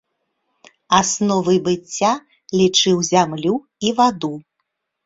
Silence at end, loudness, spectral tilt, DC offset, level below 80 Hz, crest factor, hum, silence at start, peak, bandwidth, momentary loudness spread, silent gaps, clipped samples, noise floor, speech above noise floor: 0.65 s; -18 LUFS; -4 dB/octave; under 0.1%; -56 dBFS; 18 dB; none; 0.9 s; 0 dBFS; 7.8 kHz; 10 LU; none; under 0.1%; -75 dBFS; 58 dB